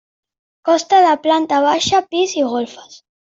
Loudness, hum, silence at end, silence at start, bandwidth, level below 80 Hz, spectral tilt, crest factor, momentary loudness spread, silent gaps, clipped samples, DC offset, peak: -15 LUFS; none; 0.35 s; 0.65 s; 7.8 kHz; -60 dBFS; -3 dB/octave; 14 dB; 10 LU; none; under 0.1%; under 0.1%; -2 dBFS